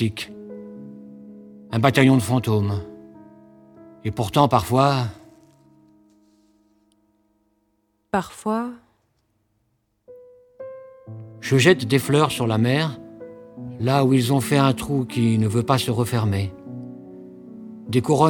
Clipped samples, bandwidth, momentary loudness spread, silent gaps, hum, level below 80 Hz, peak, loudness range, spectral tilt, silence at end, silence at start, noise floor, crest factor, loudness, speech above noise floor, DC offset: under 0.1%; 19 kHz; 24 LU; none; none; -54 dBFS; 0 dBFS; 11 LU; -6 dB/octave; 0 s; 0 s; -69 dBFS; 22 dB; -21 LUFS; 50 dB; under 0.1%